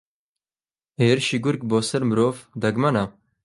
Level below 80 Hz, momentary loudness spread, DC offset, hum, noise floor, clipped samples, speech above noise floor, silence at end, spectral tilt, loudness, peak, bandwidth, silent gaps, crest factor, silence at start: -58 dBFS; 6 LU; under 0.1%; none; under -90 dBFS; under 0.1%; over 69 dB; 0.35 s; -5.5 dB/octave; -22 LUFS; -4 dBFS; 11.5 kHz; none; 20 dB; 1 s